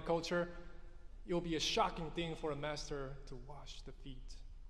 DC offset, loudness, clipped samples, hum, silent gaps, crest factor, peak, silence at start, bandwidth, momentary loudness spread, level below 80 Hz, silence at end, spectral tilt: under 0.1%; -40 LUFS; under 0.1%; none; none; 20 dB; -20 dBFS; 0 s; 13.5 kHz; 21 LU; -52 dBFS; 0 s; -4.5 dB/octave